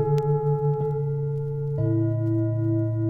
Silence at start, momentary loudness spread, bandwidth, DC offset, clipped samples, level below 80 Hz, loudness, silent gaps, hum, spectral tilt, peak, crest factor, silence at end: 0 s; 5 LU; 5 kHz; under 0.1%; under 0.1%; -50 dBFS; -25 LUFS; none; none; -11.5 dB/octave; -14 dBFS; 10 dB; 0 s